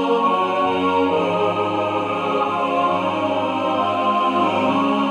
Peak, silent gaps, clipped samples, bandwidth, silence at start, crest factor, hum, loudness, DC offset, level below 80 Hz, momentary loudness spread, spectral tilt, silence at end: -6 dBFS; none; under 0.1%; 11 kHz; 0 s; 14 dB; none; -19 LUFS; under 0.1%; -64 dBFS; 3 LU; -6 dB/octave; 0 s